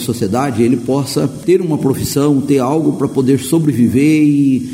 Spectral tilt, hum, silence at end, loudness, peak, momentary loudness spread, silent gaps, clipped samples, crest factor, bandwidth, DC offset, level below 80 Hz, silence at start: -6.5 dB/octave; none; 0 s; -13 LUFS; -2 dBFS; 5 LU; none; under 0.1%; 12 dB; 16.5 kHz; under 0.1%; -46 dBFS; 0 s